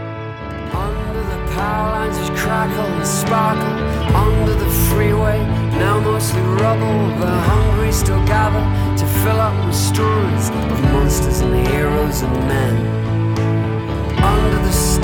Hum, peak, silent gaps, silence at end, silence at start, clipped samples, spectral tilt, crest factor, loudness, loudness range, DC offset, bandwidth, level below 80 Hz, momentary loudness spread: none; -4 dBFS; none; 0 s; 0 s; under 0.1%; -6 dB/octave; 12 dB; -17 LUFS; 2 LU; under 0.1%; 19 kHz; -24 dBFS; 6 LU